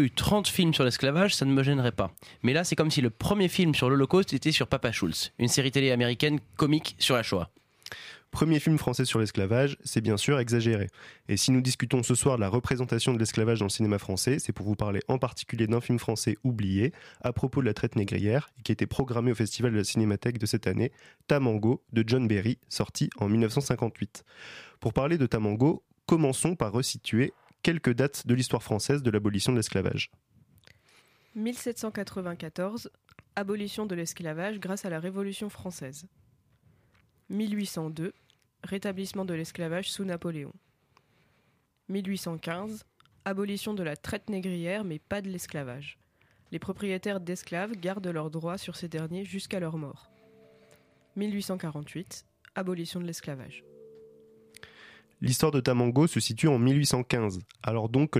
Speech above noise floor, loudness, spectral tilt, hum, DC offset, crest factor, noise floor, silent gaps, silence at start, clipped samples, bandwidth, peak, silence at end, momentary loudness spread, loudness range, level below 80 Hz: 42 dB; -28 LUFS; -5 dB/octave; none; under 0.1%; 18 dB; -71 dBFS; none; 0 s; under 0.1%; 15.5 kHz; -12 dBFS; 0 s; 13 LU; 11 LU; -56 dBFS